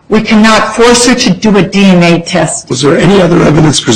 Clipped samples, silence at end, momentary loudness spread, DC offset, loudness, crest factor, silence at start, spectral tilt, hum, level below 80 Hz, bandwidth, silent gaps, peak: 0.4%; 0 s; 5 LU; under 0.1%; -6 LUFS; 6 dB; 0.1 s; -4.5 dB/octave; none; -30 dBFS; 12.5 kHz; none; 0 dBFS